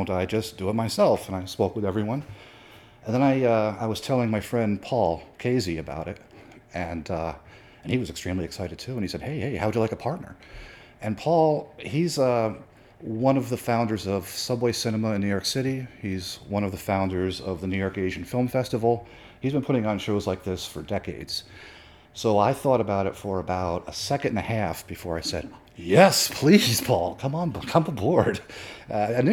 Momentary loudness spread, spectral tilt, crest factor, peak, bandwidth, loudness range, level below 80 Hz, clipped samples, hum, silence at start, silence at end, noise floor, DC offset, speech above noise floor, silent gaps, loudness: 13 LU; -5.5 dB/octave; 22 dB; -4 dBFS; 19.5 kHz; 8 LU; -52 dBFS; under 0.1%; none; 0 s; 0 s; -50 dBFS; under 0.1%; 24 dB; none; -26 LUFS